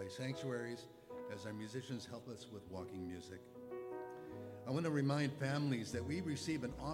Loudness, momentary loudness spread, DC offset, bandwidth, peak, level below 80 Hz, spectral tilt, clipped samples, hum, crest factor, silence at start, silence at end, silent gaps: -43 LUFS; 14 LU; under 0.1%; 16.5 kHz; -24 dBFS; -68 dBFS; -6 dB/octave; under 0.1%; none; 18 dB; 0 s; 0 s; none